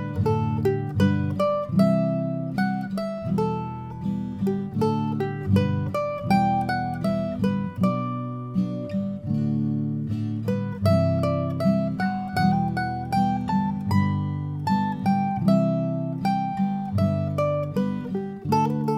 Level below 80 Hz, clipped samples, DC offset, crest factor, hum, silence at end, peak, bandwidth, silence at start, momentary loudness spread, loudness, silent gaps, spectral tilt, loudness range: -52 dBFS; under 0.1%; under 0.1%; 16 dB; none; 0 s; -8 dBFS; 13.5 kHz; 0 s; 7 LU; -25 LUFS; none; -8.5 dB/octave; 2 LU